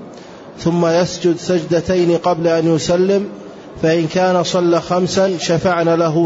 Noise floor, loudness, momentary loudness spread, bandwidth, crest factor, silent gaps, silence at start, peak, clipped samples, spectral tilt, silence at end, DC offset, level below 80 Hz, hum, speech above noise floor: -35 dBFS; -15 LUFS; 9 LU; 8 kHz; 12 dB; none; 0 s; -4 dBFS; under 0.1%; -5.5 dB/octave; 0 s; under 0.1%; -48 dBFS; none; 20 dB